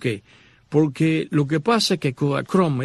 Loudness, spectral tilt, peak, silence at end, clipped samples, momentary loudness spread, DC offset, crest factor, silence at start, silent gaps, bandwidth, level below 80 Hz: -21 LUFS; -6 dB/octave; -6 dBFS; 0 s; under 0.1%; 5 LU; under 0.1%; 14 dB; 0 s; none; 12.5 kHz; -60 dBFS